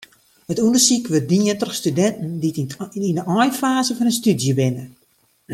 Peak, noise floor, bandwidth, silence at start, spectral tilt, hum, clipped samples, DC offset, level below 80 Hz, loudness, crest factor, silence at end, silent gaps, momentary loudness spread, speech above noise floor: -2 dBFS; -53 dBFS; 16.5 kHz; 0.5 s; -4.5 dB/octave; none; under 0.1%; under 0.1%; -62 dBFS; -19 LUFS; 18 dB; 0 s; none; 10 LU; 34 dB